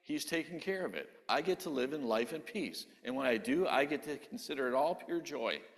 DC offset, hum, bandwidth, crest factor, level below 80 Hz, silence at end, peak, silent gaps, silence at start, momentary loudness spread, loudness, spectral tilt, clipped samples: under 0.1%; none; 14 kHz; 20 dB; -76 dBFS; 0.1 s; -16 dBFS; none; 0.05 s; 9 LU; -36 LUFS; -4 dB/octave; under 0.1%